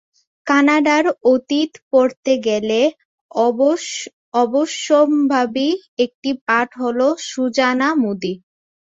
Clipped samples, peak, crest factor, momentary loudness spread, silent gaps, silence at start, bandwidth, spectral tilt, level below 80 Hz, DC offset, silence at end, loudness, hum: under 0.1%; -2 dBFS; 16 dB; 8 LU; 1.82-1.91 s, 2.17-2.23 s, 3.05-3.29 s, 4.13-4.32 s, 5.88-5.97 s, 6.15-6.22 s, 6.41-6.46 s; 0.45 s; 8 kHz; -3.5 dB/octave; -64 dBFS; under 0.1%; 0.6 s; -17 LUFS; none